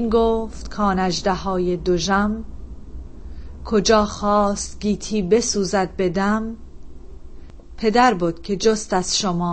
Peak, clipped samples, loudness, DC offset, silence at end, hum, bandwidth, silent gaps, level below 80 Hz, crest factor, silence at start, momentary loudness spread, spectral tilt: -4 dBFS; under 0.1%; -20 LUFS; under 0.1%; 0 s; none; 8.8 kHz; none; -36 dBFS; 18 dB; 0 s; 22 LU; -4.5 dB/octave